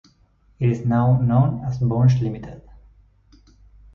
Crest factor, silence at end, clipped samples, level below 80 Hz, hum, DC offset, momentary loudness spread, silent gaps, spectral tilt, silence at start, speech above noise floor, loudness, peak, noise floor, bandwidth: 14 dB; 1.35 s; under 0.1%; -46 dBFS; none; under 0.1%; 10 LU; none; -10 dB/octave; 0.6 s; 39 dB; -20 LUFS; -6 dBFS; -58 dBFS; 6.6 kHz